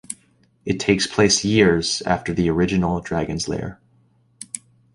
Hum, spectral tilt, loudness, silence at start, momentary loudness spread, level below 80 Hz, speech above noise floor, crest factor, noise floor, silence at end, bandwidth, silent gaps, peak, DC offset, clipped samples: none; -4.5 dB/octave; -20 LUFS; 0.1 s; 18 LU; -42 dBFS; 40 dB; 18 dB; -59 dBFS; 0.35 s; 11.5 kHz; none; -4 dBFS; under 0.1%; under 0.1%